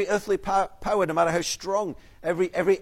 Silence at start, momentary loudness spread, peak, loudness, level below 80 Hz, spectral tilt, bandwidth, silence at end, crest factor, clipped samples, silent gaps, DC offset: 0 s; 6 LU; -10 dBFS; -26 LUFS; -50 dBFS; -4 dB/octave; 15.5 kHz; 0 s; 16 dB; under 0.1%; none; under 0.1%